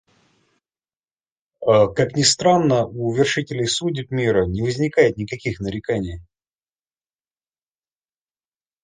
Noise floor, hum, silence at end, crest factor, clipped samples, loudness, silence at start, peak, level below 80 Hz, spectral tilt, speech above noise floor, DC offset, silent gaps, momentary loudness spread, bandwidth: under -90 dBFS; none; 2.6 s; 20 dB; under 0.1%; -19 LUFS; 1.6 s; -2 dBFS; -46 dBFS; -4.5 dB/octave; over 71 dB; under 0.1%; none; 10 LU; 10 kHz